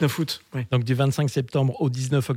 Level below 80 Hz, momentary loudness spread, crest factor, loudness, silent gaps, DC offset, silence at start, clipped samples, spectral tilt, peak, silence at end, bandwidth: -64 dBFS; 6 LU; 14 dB; -24 LUFS; none; under 0.1%; 0 s; under 0.1%; -6.5 dB/octave; -10 dBFS; 0 s; 16 kHz